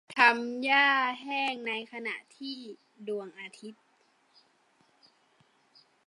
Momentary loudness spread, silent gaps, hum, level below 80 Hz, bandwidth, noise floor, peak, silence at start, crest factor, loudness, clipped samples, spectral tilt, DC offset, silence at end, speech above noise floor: 22 LU; none; none; under -90 dBFS; 11.5 kHz; -68 dBFS; -8 dBFS; 0.1 s; 24 dB; -28 LUFS; under 0.1%; -2.5 dB/octave; under 0.1%; 2.35 s; 38 dB